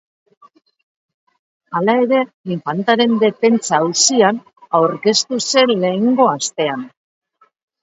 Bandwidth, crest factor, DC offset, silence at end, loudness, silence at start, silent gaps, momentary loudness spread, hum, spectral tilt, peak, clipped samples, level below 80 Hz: 8 kHz; 18 dB; under 0.1%; 0.95 s; -15 LUFS; 1.7 s; 2.34-2.44 s; 10 LU; none; -3.5 dB/octave; 0 dBFS; under 0.1%; -68 dBFS